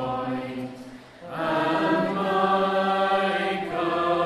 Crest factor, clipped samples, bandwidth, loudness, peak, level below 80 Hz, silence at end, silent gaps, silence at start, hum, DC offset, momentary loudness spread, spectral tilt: 16 dB; under 0.1%; 13 kHz; -24 LUFS; -8 dBFS; -60 dBFS; 0 s; none; 0 s; none; under 0.1%; 15 LU; -6 dB/octave